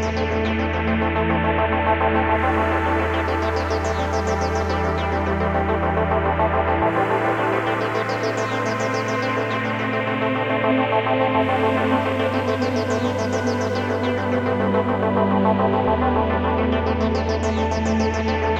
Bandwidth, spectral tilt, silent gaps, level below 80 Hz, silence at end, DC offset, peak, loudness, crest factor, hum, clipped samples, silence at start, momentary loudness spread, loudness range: 9.6 kHz; -6.5 dB/octave; none; -34 dBFS; 0 s; under 0.1%; -6 dBFS; -21 LUFS; 14 dB; none; under 0.1%; 0 s; 3 LU; 2 LU